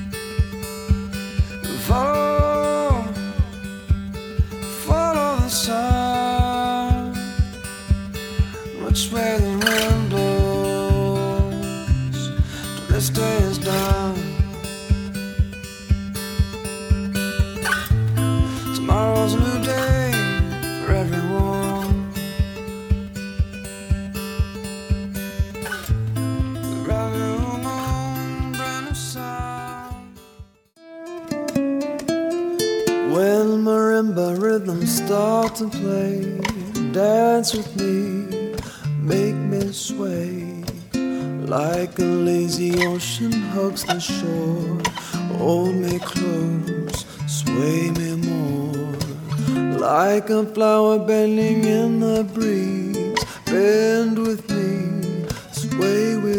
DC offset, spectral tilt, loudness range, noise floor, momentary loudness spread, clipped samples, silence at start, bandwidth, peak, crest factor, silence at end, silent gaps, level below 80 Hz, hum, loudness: under 0.1%; -5.5 dB/octave; 6 LU; -47 dBFS; 9 LU; under 0.1%; 0 s; over 20 kHz; -2 dBFS; 20 dB; 0 s; none; -30 dBFS; none; -22 LUFS